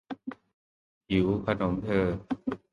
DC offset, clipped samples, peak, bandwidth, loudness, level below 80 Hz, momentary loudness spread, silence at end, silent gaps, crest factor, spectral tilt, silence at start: under 0.1%; under 0.1%; -12 dBFS; 9.8 kHz; -29 LUFS; -50 dBFS; 14 LU; 0.15 s; 0.54-1.01 s; 18 dB; -8.5 dB/octave; 0.1 s